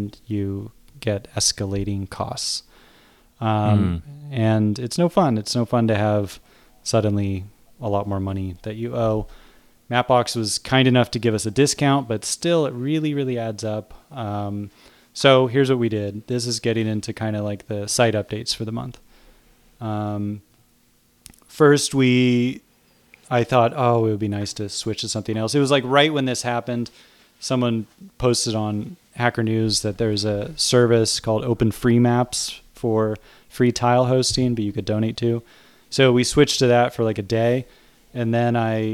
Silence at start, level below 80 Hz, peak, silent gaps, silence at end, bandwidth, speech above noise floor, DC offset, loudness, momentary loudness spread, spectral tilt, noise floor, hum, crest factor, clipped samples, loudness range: 0 s; -50 dBFS; -2 dBFS; none; 0 s; 15.5 kHz; 39 dB; under 0.1%; -21 LUFS; 12 LU; -5 dB/octave; -59 dBFS; none; 20 dB; under 0.1%; 5 LU